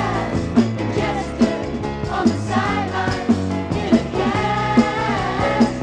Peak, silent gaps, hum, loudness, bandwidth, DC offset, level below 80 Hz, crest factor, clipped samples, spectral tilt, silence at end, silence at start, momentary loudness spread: -2 dBFS; none; none; -20 LUFS; 9.8 kHz; under 0.1%; -36 dBFS; 18 dB; under 0.1%; -6.5 dB/octave; 0 s; 0 s; 5 LU